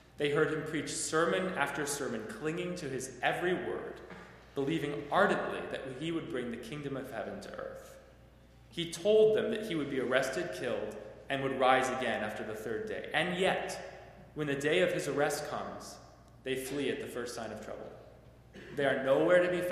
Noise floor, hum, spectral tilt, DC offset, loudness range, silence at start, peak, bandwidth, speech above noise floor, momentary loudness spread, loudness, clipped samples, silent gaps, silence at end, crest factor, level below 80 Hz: -58 dBFS; none; -4.5 dB/octave; under 0.1%; 6 LU; 0.2 s; -10 dBFS; 15.5 kHz; 25 dB; 17 LU; -33 LUFS; under 0.1%; none; 0 s; 24 dB; -62 dBFS